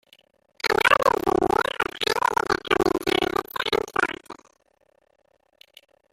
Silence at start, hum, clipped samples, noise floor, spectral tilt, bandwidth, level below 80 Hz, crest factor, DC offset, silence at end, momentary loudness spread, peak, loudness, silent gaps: 0.65 s; none; under 0.1%; -65 dBFS; -3.5 dB/octave; 16.5 kHz; -52 dBFS; 22 dB; under 0.1%; 1.8 s; 8 LU; -4 dBFS; -23 LUFS; none